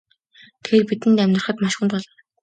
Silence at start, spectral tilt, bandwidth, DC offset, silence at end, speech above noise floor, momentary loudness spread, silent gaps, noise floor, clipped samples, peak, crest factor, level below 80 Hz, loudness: 0.65 s; -5.5 dB/octave; 9.2 kHz; under 0.1%; 0.35 s; 33 dB; 8 LU; none; -52 dBFS; under 0.1%; -4 dBFS; 18 dB; -64 dBFS; -19 LUFS